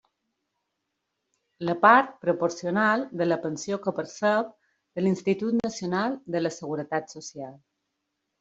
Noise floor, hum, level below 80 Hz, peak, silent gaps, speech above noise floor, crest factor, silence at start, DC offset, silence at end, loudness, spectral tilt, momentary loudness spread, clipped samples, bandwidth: -81 dBFS; none; -70 dBFS; -4 dBFS; none; 55 dB; 24 dB; 1.6 s; under 0.1%; 0.85 s; -26 LUFS; -5.5 dB/octave; 17 LU; under 0.1%; 8 kHz